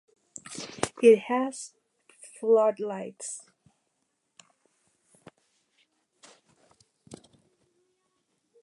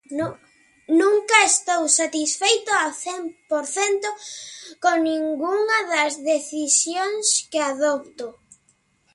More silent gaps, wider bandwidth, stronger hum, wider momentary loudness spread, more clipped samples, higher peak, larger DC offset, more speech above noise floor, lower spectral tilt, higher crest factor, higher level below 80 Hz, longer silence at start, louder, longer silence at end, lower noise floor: neither; about the same, 11.5 kHz vs 11.5 kHz; neither; first, 24 LU vs 13 LU; neither; second, -6 dBFS vs 0 dBFS; neither; first, 53 dB vs 42 dB; first, -4 dB/octave vs -1 dB/octave; about the same, 24 dB vs 22 dB; about the same, -74 dBFS vs -72 dBFS; first, 0.5 s vs 0.1 s; second, -26 LUFS vs -20 LUFS; first, 1.5 s vs 0.85 s; first, -77 dBFS vs -64 dBFS